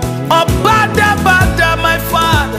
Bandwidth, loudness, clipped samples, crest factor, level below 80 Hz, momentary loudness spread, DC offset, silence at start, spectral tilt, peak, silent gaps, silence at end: 16 kHz; -11 LUFS; under 0.1%; 10 dB; -24 dBFS; 3 LU; under 0.1%; 0 s; -4.5 dB/octave; 0 dBFS; none; 0 s